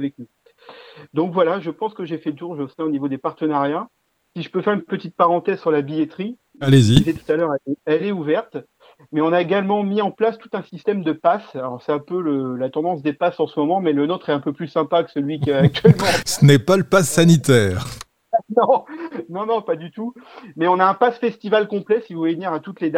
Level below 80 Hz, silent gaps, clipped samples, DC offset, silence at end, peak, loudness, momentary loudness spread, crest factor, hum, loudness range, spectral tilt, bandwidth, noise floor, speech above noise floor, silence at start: -48 dBFS; none; under 0.1%; under 0.1%; 0 s; 0 dBFS; -19 LUFS; 15 LU; 20 dB; none; 7 LU; -6 dB/octave; 16.5 kHz; -45 dBFS; 26 dB; 0 s